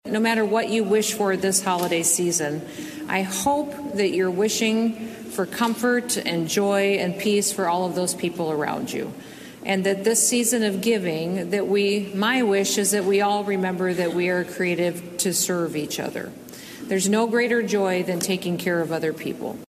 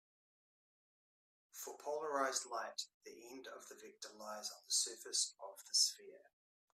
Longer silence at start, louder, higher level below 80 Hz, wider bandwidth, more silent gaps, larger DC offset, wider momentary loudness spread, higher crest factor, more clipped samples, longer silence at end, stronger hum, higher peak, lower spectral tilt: second, 0.05 s vs 1.55 s; first, -22 LUFS vs -39 LUFS; first, -66 dBFS vs under -90 dBFS; about the same, 14.5 kHz vs 15.5 kHz; second, none vs 2.94-3.01 s; neither; second, 9 LU vs 20 LU; second, 16 dB vs 24 dB; neither; second, 0.05 s vs 0.6 s; neither; first, -6 dBFS vs -22 dBFS; first, -3.5 dB/octave vs 1.5 dB/octave